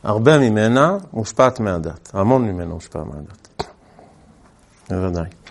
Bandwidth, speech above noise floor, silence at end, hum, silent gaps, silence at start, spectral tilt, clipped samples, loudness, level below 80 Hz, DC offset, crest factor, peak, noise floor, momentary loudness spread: 11.5 kHz; 33 dB; 0 s; none; none; 0.05 s; -6.5 dB/octave; under 0.1%; -18 LUFS; -46 dBFS; under 0.1%; 20 dB; 0 dBFS; -51 dBFS; 18 LU